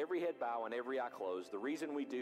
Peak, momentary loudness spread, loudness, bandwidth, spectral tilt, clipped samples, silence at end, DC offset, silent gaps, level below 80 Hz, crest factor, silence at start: -30 dBFS; 3 LU; -41 LUFS; 15 kHz; -4.5 dB/octave; under 0.1%; 0 s; under 0.1%; none; -90 dBFS; 12 dB; 0 s